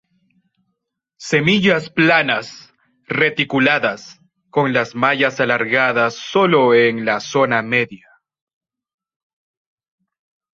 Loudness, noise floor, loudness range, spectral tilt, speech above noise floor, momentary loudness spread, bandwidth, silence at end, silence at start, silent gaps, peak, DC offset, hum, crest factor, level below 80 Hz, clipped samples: -16 LUFS; -75 dBFS; 5 LU; -5 dB/octave; 59 dB; 9 LU; 8 kHz; 2.6 s; 1.2 s; none; -2 dBFS; under 0.1%; none; 18 dB; -60 dBFS; under 0.1%